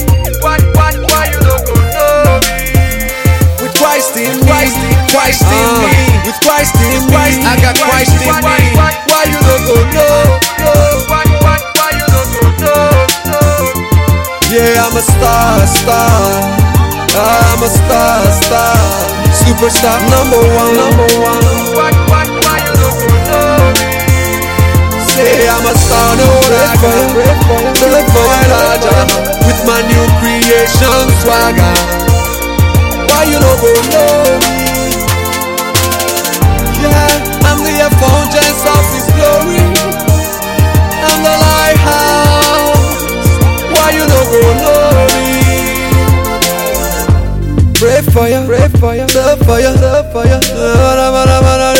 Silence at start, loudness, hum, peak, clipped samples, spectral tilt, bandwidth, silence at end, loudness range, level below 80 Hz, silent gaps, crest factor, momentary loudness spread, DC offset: 0 s; -8 LUFS; none; 0 dBFS; 0.3%; -4.5 dB/octave; 17.5 kHz; 0 s; 2 LU; -18 dBFS; none; 8 dB; 4 LU; under 0.1%